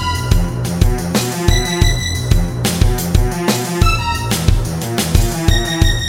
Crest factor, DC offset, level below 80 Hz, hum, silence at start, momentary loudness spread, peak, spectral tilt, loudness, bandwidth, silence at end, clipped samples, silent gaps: 14 dB; under 0.1%; -18 dBFS; none; 0 s; 3 LU; 0 dBFS; -4.5 dB/octave; -16 LUFS; 17 kHz; 0 s; under 0.1%; none